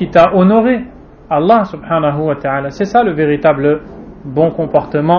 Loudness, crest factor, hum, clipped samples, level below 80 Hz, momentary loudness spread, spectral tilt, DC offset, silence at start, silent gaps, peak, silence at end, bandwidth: -13 LUFS; 12 dB; none; 0.2%; -42 dBFS; 10 LU; -8.5 dB/octave; under 0.1%; 0 s; none; 0 dBFS; 0 s; 6.8 kHz